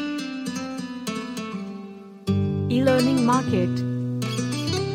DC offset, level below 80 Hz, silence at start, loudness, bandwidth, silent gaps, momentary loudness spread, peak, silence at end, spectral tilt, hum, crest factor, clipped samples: under 0.1%; -64 dBFS; 0 s; -24 LUFS; 16 kHz; none; 14 LU; -6 dBFS; 0 s; -6 dB/octave; none; 18 dB; under 0.1%